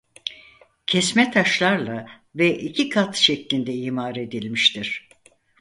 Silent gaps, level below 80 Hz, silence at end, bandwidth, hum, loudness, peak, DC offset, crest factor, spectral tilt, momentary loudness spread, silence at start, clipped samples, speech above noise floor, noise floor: none; -64 dBFS; 0.6 s; 11.5 kHz; none; -21 LUFS; -2 dBFS; under 0.1%; 22 dB; -3.5 dB/octave; 15 LU; 0.25 s; under 0.1%; 35 dB; -56 dBFS